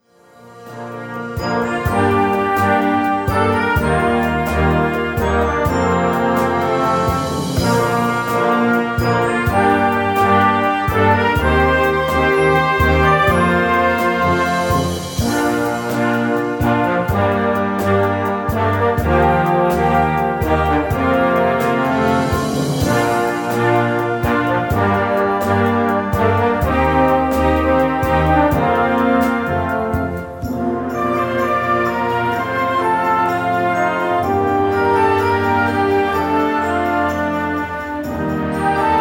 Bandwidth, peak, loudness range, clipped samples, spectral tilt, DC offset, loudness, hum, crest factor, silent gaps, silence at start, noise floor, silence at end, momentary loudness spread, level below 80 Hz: 19 kHz; -2 dBFS; 3 LU; under 0.1%; -6.5 dB/octave; under 0.1%; -16 LUFS; none; 14 dB; none; 0.45 s; -45 dBFS; 0 s; 5 LU; -32 dBFS